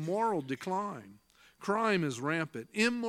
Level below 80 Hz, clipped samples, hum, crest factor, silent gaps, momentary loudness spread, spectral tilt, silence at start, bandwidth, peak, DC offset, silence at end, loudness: -76 dBFS; under 0.1%; none; 18 dB; none; 10 LU; -5 dB/octave; 0 s; 15.5 kHz; -16 dBFS; under 0.1%; 0 s; -33 LUFS